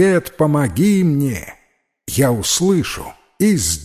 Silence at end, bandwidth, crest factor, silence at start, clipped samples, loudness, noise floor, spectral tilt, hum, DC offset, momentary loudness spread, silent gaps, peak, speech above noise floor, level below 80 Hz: 0 s; 15.5 kHz; 14 dB; 0 s; under 0.1%; -16 LUFS; -60 dBFS; -5 dB/octave; none; under 0.1%; 14 LU; none; -2 dBFS; 44 dB; -40 dBFS